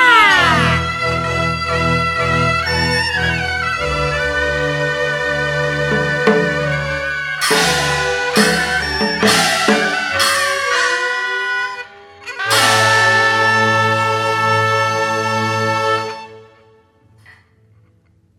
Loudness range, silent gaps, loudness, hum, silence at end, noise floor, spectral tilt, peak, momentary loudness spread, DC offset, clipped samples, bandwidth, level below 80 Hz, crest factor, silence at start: 4 LU; none; -15 LUFS; none; 1.05 s; -54 dBFS; -3.5 dB/octave; 0 dBFS; 7 LU; under 0.1%; under 0.1%; 16.5 kHz; -38 dBFS; 16 dB; 0 s